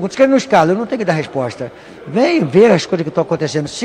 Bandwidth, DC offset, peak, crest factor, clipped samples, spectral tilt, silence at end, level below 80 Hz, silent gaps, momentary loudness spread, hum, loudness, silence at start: 10.5 kHz; under 0.1%; 0 dBFS; 14 dB; under 0.1%; -6 dB/octave; 0 s; -54 dBFS; none; 12 LU; none; -14 LUFS; 0 s